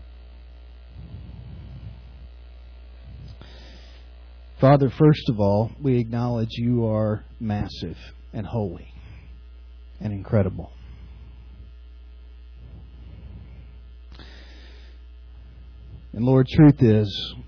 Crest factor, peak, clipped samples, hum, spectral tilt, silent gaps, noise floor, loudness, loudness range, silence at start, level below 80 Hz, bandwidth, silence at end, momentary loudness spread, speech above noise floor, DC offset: 20 dB; -6 dBFS; under 0.1%; none; -9.5 dB/octave; none; -43 dBFS; -21 LUFS; 23 LU; 0 s; -42 dBFS; 5.4 kHz; 0 s; 27 LU; 23 dB; under 0.1%